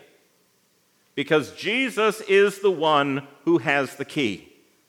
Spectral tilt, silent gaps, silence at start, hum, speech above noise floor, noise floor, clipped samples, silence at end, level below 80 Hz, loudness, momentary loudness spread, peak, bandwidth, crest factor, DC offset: -5 dB/octave; none; 1.15 s; none; 42 dB; -64 dBFS; under 0.1%; 0.5 s; -78 dBFS; -22 LUFS; 9 LU; -6 dBFS; 16 kHz; 18 dB; under 0.1%